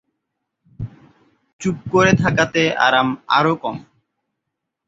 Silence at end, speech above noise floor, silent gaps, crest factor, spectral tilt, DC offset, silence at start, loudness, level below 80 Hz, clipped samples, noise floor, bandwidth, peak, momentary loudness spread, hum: 1.05 s; 62 dB; 1.53-1.59 s; 20 dB; -5 dB/octave; under 0.1%; 0.8 s; -17 LUFS; -48 dBFS; under 0.1%; -79 dBFS; 8 kHz; -2 dBFS; 19 LU; none